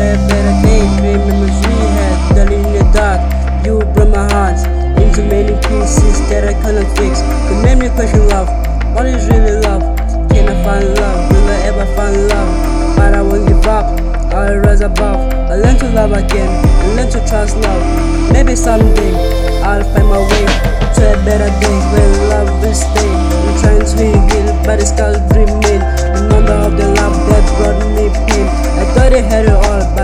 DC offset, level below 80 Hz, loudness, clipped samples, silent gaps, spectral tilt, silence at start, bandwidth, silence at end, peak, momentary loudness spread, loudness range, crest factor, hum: 0.4%; -10 dBFS; -12 LUFS; 0.2%; none; -6 dB/octave; 0 s; 13 kHz; 0 s; 0 dBFS; 4 LU; 1 LU; 8 dB; none